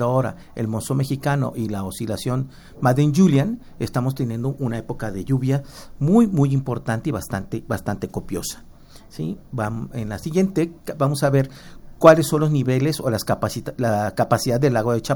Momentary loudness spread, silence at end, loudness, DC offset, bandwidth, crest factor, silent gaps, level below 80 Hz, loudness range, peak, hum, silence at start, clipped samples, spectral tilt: 12 LU; 0 s; -21 LUFS; under 0.1%; 18.5 kHz; 20 dB; none; -44 dBFS; 7 LU; 0 dBFS; none; 0 s; under 0.1%; -6.5 dB/octave